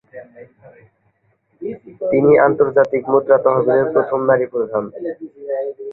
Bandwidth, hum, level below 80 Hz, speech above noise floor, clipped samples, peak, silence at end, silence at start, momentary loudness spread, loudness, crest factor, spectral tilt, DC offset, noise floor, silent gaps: 4.1 kHz; none; -58 dBFS; 47 dB; under 0.1%; -2 dBFS; 0 s; 0.15 s; 17 LU; -16 LUFS; 16 dB; -10.5 dB/octave; under 0.1%; -62 dBFS; none